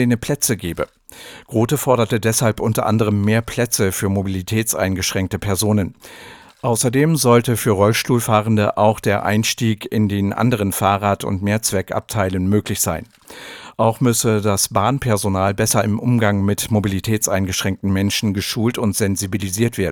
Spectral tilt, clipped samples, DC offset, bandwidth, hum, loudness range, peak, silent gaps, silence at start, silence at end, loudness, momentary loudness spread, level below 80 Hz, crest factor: -5 dB/octave; under 0.1%; under 0.1%; 20 kHz; none; 3 LU; 0 dBFS; none; 0 s; 0 s; -18 LUFS; 7 LU; -46 dBFS; 18 dB